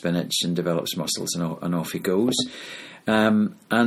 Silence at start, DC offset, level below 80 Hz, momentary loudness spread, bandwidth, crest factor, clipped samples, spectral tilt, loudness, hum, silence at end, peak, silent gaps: 0.05 s; under 0.1%; -62 dBFS; 9 LU; 16 kHz; 18 dB; under 0.1%; -4.5 dB/octave; -24 LUFS; none; 0 s; -6 dBFS; none